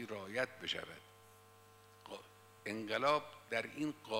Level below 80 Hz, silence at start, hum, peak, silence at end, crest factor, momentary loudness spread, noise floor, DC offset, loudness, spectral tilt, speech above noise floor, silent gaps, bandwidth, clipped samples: -82 dBFS; 0 s; 50 Hz at -70 dBFS; -20 dBFS; 0 s; 22 dB; 21 LU; -63 dBFS; under 0.1%; -39 LUFS; -4 dB/octave; 23 dB; none; 16 kHz; under 0.1%